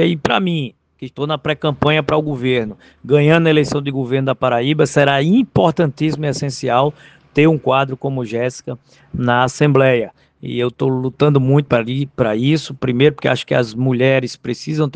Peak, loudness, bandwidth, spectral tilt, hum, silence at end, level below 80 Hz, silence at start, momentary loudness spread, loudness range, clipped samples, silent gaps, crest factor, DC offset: 0 dBFS; -16 LUFS; 9.4 kHz; -6.5 dB/octave; none; 0.05 s; -50 dBFS; 0 s; 11 LU; 3 LU; under 0.1%; none; 16 dB; under 0.1%